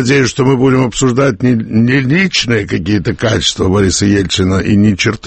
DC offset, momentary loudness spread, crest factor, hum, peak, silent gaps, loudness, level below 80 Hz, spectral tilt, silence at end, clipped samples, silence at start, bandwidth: under 0.1%; 3 LU; 12 dB; none; 0 dBFS; none; -11 LUFS; -34 dBFS; -5 dB/octave; 0 s; under 0.1%; 0 s; 8.8 kHz